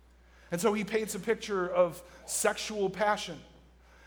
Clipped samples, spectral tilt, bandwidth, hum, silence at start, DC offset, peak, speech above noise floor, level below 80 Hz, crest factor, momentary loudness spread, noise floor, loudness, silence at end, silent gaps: under 0.1%; -3.5 dB/octave; over 20 kHz; none; 0.5 s; under 0.1%; -12 dBFS; 27 dB; -60 dBFS; 20 dB; 10 LU; -58 dBFS; -31 LUFS; 0.6 s; none